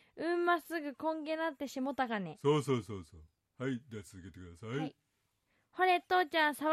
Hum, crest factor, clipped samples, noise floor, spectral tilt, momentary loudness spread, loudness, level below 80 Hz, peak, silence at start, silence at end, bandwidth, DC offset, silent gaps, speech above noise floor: none; 18 dB; under 0.1%; -80 dBFS; -5.5 dB/octave; 18 LU; -34 LUFS; -74 dBFS; -18 dBFS; 0.15 s; 0 s; 14.5 kHz; under 0.1%; none; 45 dB